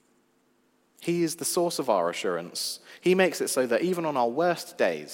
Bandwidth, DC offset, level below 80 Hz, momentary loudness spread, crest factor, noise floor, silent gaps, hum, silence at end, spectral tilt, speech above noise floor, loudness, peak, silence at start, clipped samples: 16.5 kHz; under 0.1%; -82 dBFS; 7 LU; 18 dB; -67 dBFS; none; none; 0 s; -4 dB/octave; 41 dB; -27 LUFS; -8 dBFS; 1 s; under 0.1%